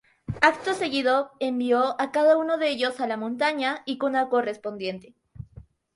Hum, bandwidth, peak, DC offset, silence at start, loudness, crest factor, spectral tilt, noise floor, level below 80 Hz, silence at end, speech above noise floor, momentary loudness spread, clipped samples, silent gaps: none; 11.5 kHz; -4 dBFS; under 0.1%; 0.3 s; -24 LUFS; 20 dB; -5 dB/octave; -50 dBFS; -58 dBFS; 0.35 s; 25 dB; 12 LU; under 0.1%; none